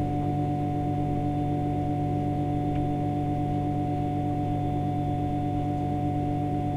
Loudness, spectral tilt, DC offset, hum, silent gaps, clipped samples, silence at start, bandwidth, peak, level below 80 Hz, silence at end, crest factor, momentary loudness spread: -28 LUFS; -9.5 dB/octave; under 0.1%; none; none; under 0.1%; 0 s; 9 kHz; -18 dBFS; -42 dBFS; 0 s; 10 dB; 1 LU